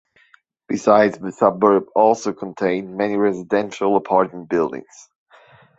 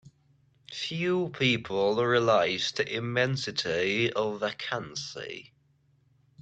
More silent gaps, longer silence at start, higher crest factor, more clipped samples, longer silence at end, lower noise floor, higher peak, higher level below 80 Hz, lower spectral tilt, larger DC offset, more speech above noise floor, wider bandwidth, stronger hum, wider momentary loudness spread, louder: neither; about the same, 0.7 s vs 0.7 s; about the same, 18 dB vs 18 dB; neither; about the same, 1 s vs 1 s; second, -56 dBFS vs -67 dBFS; first, -2 dBFS vs -12 dBFS; about the same, -62 dBFS vs -66 dBFS; first, -6 dB/octave vs -4.5 dB/octave; neither; about the same, 38 dB vs 39 dB; about the same, 8 kHz vs 8.8 kHz; neither; second, 8 LU vs 12 LU; first, -19 LUFS vs -28 LUFS